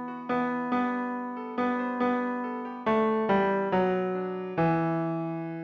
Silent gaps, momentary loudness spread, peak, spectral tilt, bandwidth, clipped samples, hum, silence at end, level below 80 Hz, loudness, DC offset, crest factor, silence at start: none; 8 LU; -14 dBFS; -9 dB/octave; 6.6 kHz; under 0.1%; none; 0 s; -64 dBFS; -28 LUFS; under 0.1%; 14 dB; 0 s